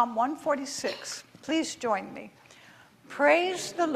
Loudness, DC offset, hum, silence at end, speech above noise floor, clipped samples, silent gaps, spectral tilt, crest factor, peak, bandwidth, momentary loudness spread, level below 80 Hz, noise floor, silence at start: -28 LUFS; under 0.1%; none; 0 s; 27 dB; under 0.1%; none; -2.5 dB/octave; 20 dB; -8 dBFS; 15 kHz; 20 LU; -74 dBFS; -55 dBFS; 0 s